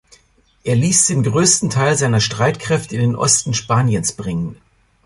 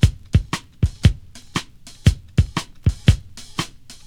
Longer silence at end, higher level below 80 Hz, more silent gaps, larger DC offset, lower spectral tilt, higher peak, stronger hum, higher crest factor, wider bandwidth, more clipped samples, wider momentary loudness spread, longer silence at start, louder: first, 0.5 s vs 0.15 s; second, -46 dBFS vs -26 dBFS; neither; neither; second, -4 dB/octave vs -5.5 dB/octave; about the same, 0 dBFS vs 0 dBFS; neither; about the same, 18 dB vs 20 dB; second, 11.5 kHz vs 14.5 kHz; neither; about the same, 10 LU vs 11 LU; first, 0.65 s vs 0 s; first, -16 LUFS vs -22 LUFS